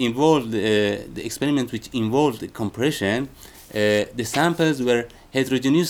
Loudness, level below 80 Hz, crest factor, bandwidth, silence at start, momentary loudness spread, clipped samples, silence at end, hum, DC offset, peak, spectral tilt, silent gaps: -22 LUFS; -52 dBFS; 18 dB; 20 kHz; 0 s; 9 LU; under 0.1%; 0 s; none; under 0.1%; -4 dBFS; -5 dB/octave; none